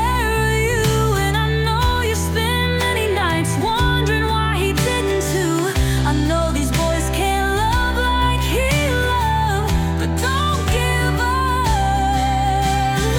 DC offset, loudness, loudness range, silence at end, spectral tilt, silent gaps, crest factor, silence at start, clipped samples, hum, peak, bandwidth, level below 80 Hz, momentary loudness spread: under 0.1%; -18 LUFS; 0 LU; 0 s; -5 dB/octave; none; 12 dB; 0 s; under 0.1%; none; -6 dBFS; 18 kHz; -24 dBFS; 2 LU